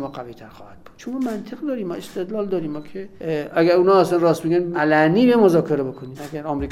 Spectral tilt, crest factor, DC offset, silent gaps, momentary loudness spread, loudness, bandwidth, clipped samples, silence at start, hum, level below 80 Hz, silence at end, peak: -7 dB/octave; 18 dB; under 0.1%; none; 17 LU; -19 LUFS; 15.5 kHz; under 0.1%; 0 s; none; -50 dBFS; 0 s; -2 dBFS